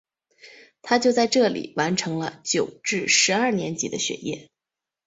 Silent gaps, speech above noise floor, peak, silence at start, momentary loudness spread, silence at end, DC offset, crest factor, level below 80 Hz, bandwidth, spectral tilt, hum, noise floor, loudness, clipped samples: none; 65 dB; -6 dBFS; 0.45 s; 12 LU; 0.65 s; under 0.1%; 20 dB; -66 dBFS; 8.2 kHz; -3 dB/octave; none; -88 dBFS; -22 LUFS; under 0.1%